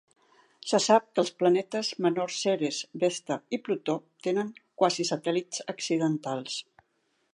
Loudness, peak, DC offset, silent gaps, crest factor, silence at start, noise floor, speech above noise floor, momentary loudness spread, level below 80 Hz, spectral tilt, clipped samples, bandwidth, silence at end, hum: -28 LUFS; -8 dBFS; under 0.1%; none; 22 dB; 0.65 s; -74 dBFS; 46 dB; 10 LU; -82 dBFS; -4 dB/octave; under 0.1%; 11.5 kHz; 0.7 s; none